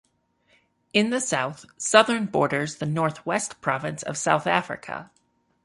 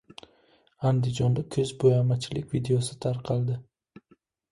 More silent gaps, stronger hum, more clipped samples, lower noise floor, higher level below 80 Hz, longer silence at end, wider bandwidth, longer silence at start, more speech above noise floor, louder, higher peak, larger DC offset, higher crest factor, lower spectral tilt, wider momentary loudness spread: neither; neither; neither; about the same, -66 dBFS vs -64 dBFS; second, -66 dBFS vs -56 dBFS; second, 0.6 s vs 0.9 s; about the same, 11.5 kHz vs 11.5 kHz; first, 0.95 s vs 0.8 s; about the same, 42 dB vs 39 dB; first, -24 LUFS vs -27 LUFS; first, -2 dBFS vs -10 dBFS; neither; first, 24 dB vs 18 dB; second, -3.5 dB/octave vs -7 dB/octave; first, 13 LU vs 8 LU